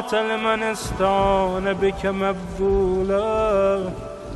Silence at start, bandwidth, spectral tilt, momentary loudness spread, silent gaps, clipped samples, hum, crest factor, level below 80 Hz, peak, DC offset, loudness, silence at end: 0 s; 12 kHz; -5.5 dB/octave; 6 LU; none; under 0.1%; none; 14 dB; -36 dBFS; -8 dBFS; under 0.1%; -21 LUFS; 0 s